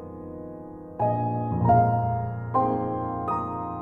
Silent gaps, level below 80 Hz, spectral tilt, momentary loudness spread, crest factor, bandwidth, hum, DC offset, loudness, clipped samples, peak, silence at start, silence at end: none; -48 dBFS; -11.5 dB/octave; 18 LU; 18 dB; 3.3 kHz; none; under 0.1%; -25 LUFS; under 0.1%; -8 dBFS; 0 s; 0 s